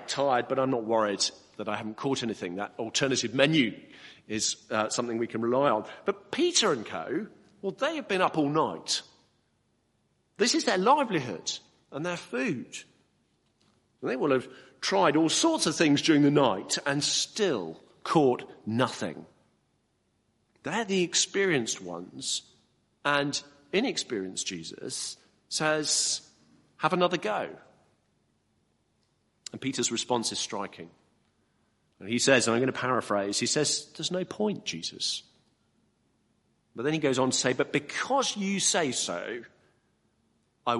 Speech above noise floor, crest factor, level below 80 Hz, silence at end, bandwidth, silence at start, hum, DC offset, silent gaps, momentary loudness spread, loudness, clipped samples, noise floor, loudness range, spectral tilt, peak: 45 dB; 24 dB; -72 dBFS; 0 s; 11.5 kHz; 0 s; none; under 0.1%; none; 13 LU; -28 LUFS; under 0.1%; -73 dBFS; 8 LU; -3 dB/octave; -6 dBFS